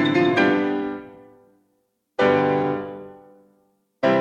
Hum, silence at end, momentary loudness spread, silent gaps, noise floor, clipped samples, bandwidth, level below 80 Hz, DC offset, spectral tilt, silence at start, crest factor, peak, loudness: none; 0 s; 18 LU; none; -70 dBFS; under 0.1%; 7.8 kHz; -64 dBFS; under 0.1%; -7 dB/octave; 0 s; 16 dB; -6 dBFS; -21 LUFS